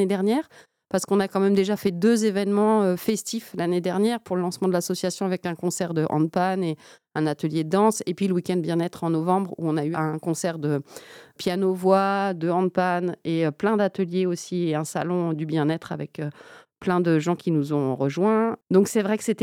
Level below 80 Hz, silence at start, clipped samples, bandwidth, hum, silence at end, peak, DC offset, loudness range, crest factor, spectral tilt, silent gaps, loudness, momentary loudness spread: -70 dBFS; 0 s; under 0.1%; 17 kHz; none; 0 s; -6 dBFS; under 0.1%; 3 LU; 18 dB; -6 dB/octave; none; -24 LUFS; 7 LU